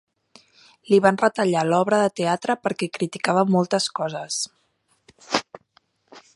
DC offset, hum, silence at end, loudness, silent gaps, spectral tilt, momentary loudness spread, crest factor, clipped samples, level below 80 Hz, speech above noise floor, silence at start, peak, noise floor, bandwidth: under 0.1%; none; 0.15 s; -22 LUFS; none; -4.5 dB/octave; 9 LU; 22 dB; under 0.1%; -70 dBFS; 46 dB; 0.9 s; 0 dBFS; -67 dBFS; 11.5 kHz